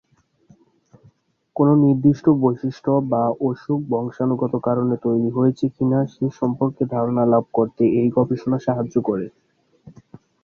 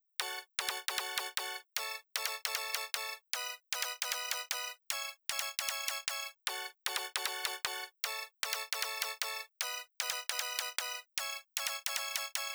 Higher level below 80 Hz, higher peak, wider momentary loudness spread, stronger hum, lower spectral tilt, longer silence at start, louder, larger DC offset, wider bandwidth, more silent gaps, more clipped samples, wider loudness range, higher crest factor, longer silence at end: first, -58 dBFS vs -80 dBFS; first, -4 dBFS vs -16 dBFS; first, 8 LU vs 3 LU; neither; first, -10.5 dB/octave vs 2.5 dB/octave; first, 1.55 s vs 0.2 s; first, -20 LUFS vs -36 LUFS; neither; second, 6.8 kHz vs over 20 kHz; neither; neither; about the same, 2 LU vs 0 LU; second, 16 dB vs 24 dB; first, 0.55 s vs 0 s